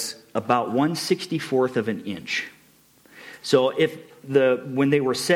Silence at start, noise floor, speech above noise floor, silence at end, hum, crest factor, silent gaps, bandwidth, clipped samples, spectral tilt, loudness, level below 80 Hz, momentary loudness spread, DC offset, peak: 0 s; -56 dBFS; 34 dB; 0 s; none; 18 dB; none; 16.5 kHz; under 0.1%; -5 dB/octave; -23 LUFS; -70 dBFS; 11 LU; under 0.1%; -6 dBFS